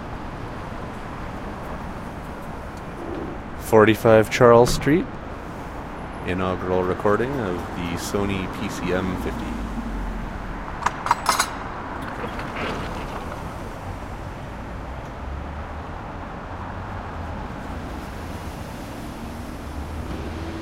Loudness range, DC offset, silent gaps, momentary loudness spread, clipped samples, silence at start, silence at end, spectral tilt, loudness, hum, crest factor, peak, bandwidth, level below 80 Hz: 14 LU; under 0.1%; none; 17 LU; under 0.1%; 0 s; 0 s; -5.5 dB/octave; -25 LUFS; none; 24 dB; 0 dBFS; 16 kHz; -36 dBFS